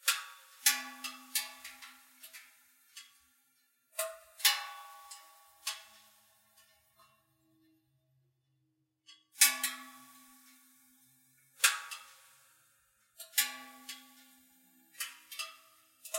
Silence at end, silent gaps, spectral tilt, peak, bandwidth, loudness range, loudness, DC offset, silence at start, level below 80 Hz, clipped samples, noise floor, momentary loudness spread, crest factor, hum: 0 s; none; 3.5 dB/octave; -8 dBFS; 16.5 kHz; 13 LU; -32 LUFS; under 0.1%; 0.05 s; under -90 dBFS; under 0.1%; -79 dBFS; 24 LU; 32 dB; none